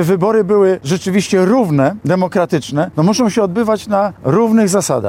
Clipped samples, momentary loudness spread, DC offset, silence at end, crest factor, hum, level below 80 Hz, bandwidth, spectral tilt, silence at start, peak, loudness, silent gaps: under 0.1%; 5 LU; under 0.1%; 0 s; 12 dB; none; -52 dBFS; 16.5 kHz; -6 dB/octave; 0 s; 0 dBFS; -14 LUFS; none